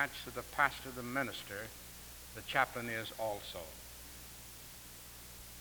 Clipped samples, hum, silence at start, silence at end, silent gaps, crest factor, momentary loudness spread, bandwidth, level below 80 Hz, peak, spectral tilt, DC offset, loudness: under 0.1%; 60 Hz at -60 dBFS; 0 s; 0 s; none; 26 dB; 16 LU; over 20 kHz; -60 dBFS; -16 dBFS; -3 dB/octave; under 0.1%; -40 LUFS